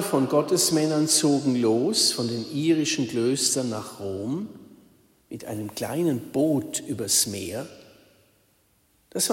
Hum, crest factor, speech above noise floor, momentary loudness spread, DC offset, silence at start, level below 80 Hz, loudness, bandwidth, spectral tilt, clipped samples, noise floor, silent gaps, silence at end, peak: none; 20 dB; 40 dB; 13 LU; under 0.1%; 0 s; -68 dBFS; -24 LUFS; 16.5 kHz; -3.5 dB/octave; under 0.1%; -65 dBFS; none; 0 s; -6 dBFS